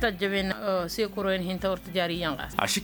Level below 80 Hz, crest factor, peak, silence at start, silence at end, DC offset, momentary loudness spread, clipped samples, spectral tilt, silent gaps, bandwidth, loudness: -48 dBFS; 24 dB; -4 dBFS; 0 s; 0 s; under 0.1%; 3 LU; under 0.1%; -4 dB/octave; none; over 20 kHz; -28 LUFS